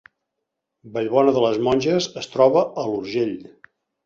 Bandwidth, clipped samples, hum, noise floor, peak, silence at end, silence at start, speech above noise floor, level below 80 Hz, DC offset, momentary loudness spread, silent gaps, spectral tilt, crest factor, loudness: 7.6 kHz; under 0.1%; none; -80 dBFS; -2 dBFS; 0.65 s; 0.85 s; 60 dB; -58 dBFS; under 0.1%; 10 LU; none; -5.5 dB/octave; 18 dB; -20 LUFS